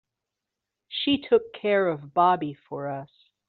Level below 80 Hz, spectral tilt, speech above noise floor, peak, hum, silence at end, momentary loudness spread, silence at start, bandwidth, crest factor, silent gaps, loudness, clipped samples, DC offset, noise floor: -66 dBFS; -3 dB/octave; 61 dB; -10 dBFS; none; 0.45 s; 13 LU; 0.9 s; 4.6 kHz; 18 dB; none; -25 LUFS; under 0.1%; under 0.1%; -86 dBFS